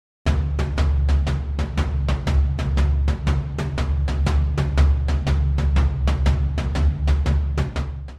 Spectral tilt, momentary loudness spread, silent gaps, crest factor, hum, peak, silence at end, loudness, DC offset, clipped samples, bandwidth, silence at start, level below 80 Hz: -7 dB/octave; 5 LU; none; 12 dB; none; -6 dBFS; 0 s; -22 LUFS; under 0.1%; under 0.1%; 8.4 kHz; 0.25 s; -22 dBFS